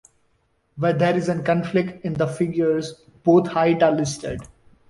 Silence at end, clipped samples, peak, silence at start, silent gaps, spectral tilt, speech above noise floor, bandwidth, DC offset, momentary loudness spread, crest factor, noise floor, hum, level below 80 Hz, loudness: 0.45 s; under 0.1%; -4 dBFS; 0.75 s; none; -6.5 dB/octave; 46 dB; 11.5 kHz; under 0.1%; 10 LU; 18 dB; -66 dBFS; none; -52 dBFS; -21 LUFS